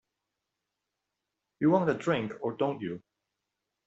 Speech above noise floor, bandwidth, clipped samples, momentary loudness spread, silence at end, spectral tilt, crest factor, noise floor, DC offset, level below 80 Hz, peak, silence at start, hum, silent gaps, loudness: 57 dB; 8 kHz; under 0.1%; 13 LU; 0.9 s; -7.5 dB/octave; 22 dB; -86 dBFS; under 0.1%; -72 dBFS; -12 dBFS; 1.6 s; 50 Hz at -70 dBFS; none; -30 LUFS